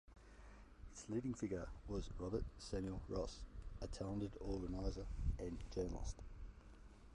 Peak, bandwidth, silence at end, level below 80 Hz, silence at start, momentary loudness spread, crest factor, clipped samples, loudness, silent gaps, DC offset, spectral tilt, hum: -28 dBFS; 11 kHz; 0 s; -52 dBFS; 0.05 s; 17 LU; 18 dB; under 0.1%; -47 LUFS; none; under 0.1%; -6.5 dB/octave; none